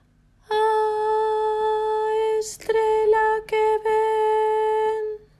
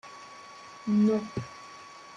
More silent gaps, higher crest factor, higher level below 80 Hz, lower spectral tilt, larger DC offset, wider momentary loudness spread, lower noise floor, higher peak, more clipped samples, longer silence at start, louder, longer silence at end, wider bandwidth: neither; about the same, 12 dB vs 14 dB; first, -56 dBFS vs -68 dBFS; second, -2 dB/octave vs -7 dB/octave; neither; second, 5 LU vs 21 LU; first, -56 dBFS vs -48 dBFS; first, -10 dBFS vs -16 dBFS; neither; first, 0.5 s vs 0.05 s; first, -22 LUFS vs -28 LUFS; first, 0.25 s vs 0 s; first, 12.5 kHz vs 8.8 kHz